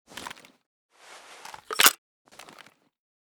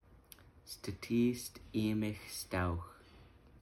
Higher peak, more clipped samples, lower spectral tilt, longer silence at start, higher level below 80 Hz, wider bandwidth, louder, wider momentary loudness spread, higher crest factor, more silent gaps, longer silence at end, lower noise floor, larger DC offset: first, 0 dBFS vs -22 dBFS; neither; second, 1.5 dB/octave vs -5.5 dB/octave; about the same, 0.15 s vs 0.1 s; second, -72 dBFS vs -58 dBFS; first, over 20 kHz vs 17 kHz; first, -20 LUFS vs -38 LUFS; first, 28 LU vs 24 LU; first, 30 dB vs 18 dB; first, 0.66-0.89 s vs none; first, 1.3 s vs 0 s; second, -54 dBFS vs -60 dBFS; neither